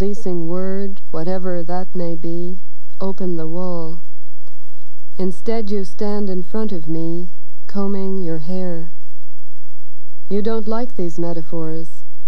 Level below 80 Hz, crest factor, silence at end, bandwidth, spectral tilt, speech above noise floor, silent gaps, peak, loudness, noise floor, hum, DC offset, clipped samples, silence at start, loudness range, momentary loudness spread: -64 dBFS; 16 dB; 0.4 s; 10.5 kHz; -8.5 dB/octave; 35 dB; none; -2 dBFS; -25 LUFS; -59 dBFS; none; 50%; under 0.1%; 0 s; 3 LU; 8 LU